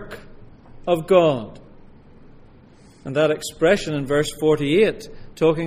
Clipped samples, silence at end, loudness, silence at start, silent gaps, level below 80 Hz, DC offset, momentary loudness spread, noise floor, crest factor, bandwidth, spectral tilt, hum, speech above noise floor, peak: under 0.1%; 0 s; -20 LUFS; 0 s; none; -44 dBFS; under 0.1%; 22 LU; -48 dBFS; 20 dB; 15.5 kHz; -5.5 dB/octave; none; 29 dB; -2 dBFS